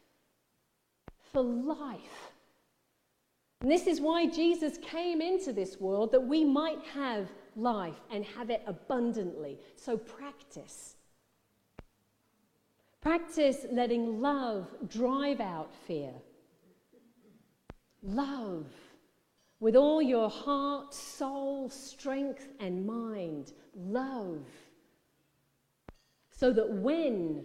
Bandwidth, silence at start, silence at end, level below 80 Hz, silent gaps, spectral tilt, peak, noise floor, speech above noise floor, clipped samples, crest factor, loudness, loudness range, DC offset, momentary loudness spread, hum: 14 kHz; 1.1 s; 0 s; -62 dBFS; none; -5.5 dB/octave; -12 dBFS; -77 dBFS; 45 dB; under 0.1%; 22 dB; -32 LUFS; 11 LU; under 0.1%; 17 LU; none